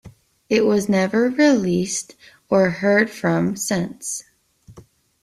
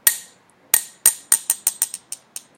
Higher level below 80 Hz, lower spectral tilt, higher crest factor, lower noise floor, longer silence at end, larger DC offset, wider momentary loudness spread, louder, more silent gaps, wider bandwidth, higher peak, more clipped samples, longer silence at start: first, -58 dBFS vs -78 dBFS; first, -5 dB/octave vs 3 dB/octave; second, 16 dB vs 22 dB; about the same, -49 dBFS vs -51 dBFS; about the same, 0.45 s vs 0.45 s; neither; second, 11 LU vs 18 LU; about the same, -19 LUFS vs -18 LUFS; neither; second, 14.5 kHz vs 18 kHz; second, -4 dBFS vs 0 dBFS; neither; about the same, 0.05 s vs 0.05 s